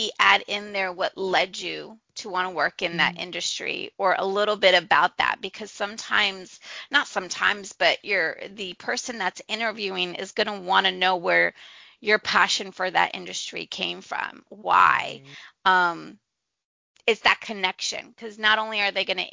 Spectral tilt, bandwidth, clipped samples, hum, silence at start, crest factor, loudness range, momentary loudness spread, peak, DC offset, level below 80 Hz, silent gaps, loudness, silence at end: -2 dB/octave; 7.8 kHz; under 0.1%; none; 0 s; 24 dB; 3 LU; 13 LU; -2 dBFS; under 0.1%; -66 dBFS; 16.65-16.95 s; -23 LUFS; 0 s